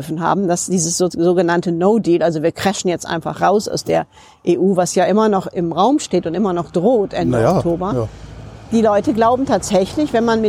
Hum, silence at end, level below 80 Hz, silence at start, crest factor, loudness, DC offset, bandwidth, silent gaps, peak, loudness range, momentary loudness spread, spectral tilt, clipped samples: none; 0 s; -44 dBFS; 0 s; 14 dB; -16 LUFS; under 0.1%; 16 kHz; none; -2 dBFS; 1 LU; 6 LU; -5.5 dB/octave; under 0.1%